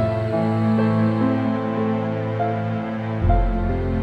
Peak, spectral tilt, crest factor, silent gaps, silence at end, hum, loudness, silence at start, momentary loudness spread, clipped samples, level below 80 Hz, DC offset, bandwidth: -6 dBFS; -9.5 dB/octave; 16 dB; none; 0 s; none; -22 LUFS; 0 s; 5 LU; under 0.1%; -28 dBFS; under 0.1%; 5.6 kHz